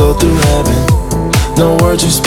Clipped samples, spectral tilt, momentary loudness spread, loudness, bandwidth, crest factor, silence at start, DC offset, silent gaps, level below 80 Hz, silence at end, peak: under 0.1%; -5 dB/octave; 3 LU; -11 LUFS; 18.5 kHz; 10 dB; 0 s; under 0.1%; none; -16 dBFS; 0 s; 0 dBFS